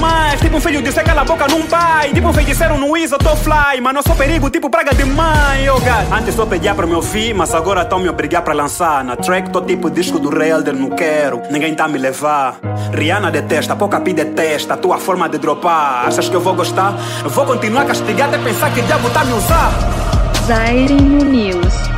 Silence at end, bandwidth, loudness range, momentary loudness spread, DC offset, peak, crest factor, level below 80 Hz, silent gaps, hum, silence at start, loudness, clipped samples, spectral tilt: 0 s; 16.5 kHz; 3 LU; 4 LU; under 0.1%; 0 dBFS; 14 dB; -22 dBFS; none; none; 0 s; -14 LUFS; under 0.1%; -5 dB/octave